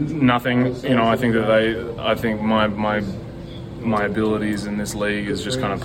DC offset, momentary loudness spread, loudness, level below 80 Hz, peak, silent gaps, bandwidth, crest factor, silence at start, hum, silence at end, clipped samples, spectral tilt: under 0.1%; 10 LU; -20 LUFS; -42 dBFS; -4 dBFS; none; 16.5 kHz; 16 dB; 0 s; none; 0 s; under 0.1%; -6 dB/octave